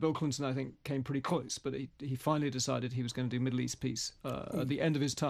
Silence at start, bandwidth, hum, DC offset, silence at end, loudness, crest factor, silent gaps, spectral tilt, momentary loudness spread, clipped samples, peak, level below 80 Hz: 0 s; 15 kHz; none; under 0.1%; 0 s; -35 LUFS; 18 dB; none; -5 dB/octave; 6 LU; under 0.1%; -16 dBFS; -64 dBFS